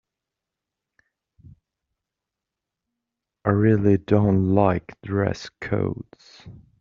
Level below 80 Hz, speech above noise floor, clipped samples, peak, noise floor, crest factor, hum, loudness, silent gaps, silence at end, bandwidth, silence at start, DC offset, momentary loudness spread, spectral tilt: -54 dBFS; 64 dB; under 0.1%; -4 dBFS; -86 dBFS; 22 dB; none; -22 LUFS; none; 0.3 s; 7.2 kHz; 3.45 s; under 0.1%; 11 LU; -8 dB/octave